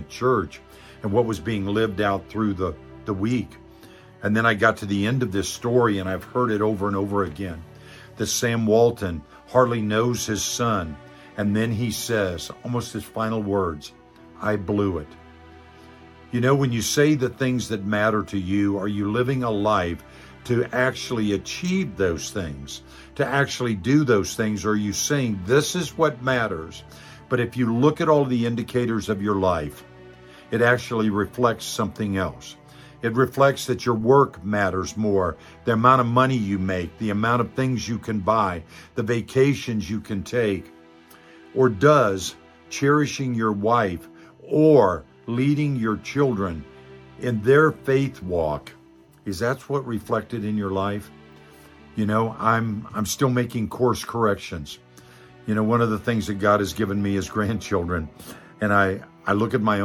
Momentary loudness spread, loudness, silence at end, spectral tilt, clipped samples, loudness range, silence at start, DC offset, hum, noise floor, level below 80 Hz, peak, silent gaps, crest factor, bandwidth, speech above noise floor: 13 LU; -23 LUFS; 0 s; -5.5 dB/octave; under 0.1%; 4 LU; 0 s; under 0.1%; none; -49 dBFS; -50 dBFS; -2 dBFS; none; 22 dB; 17.5 kHz; 27 dB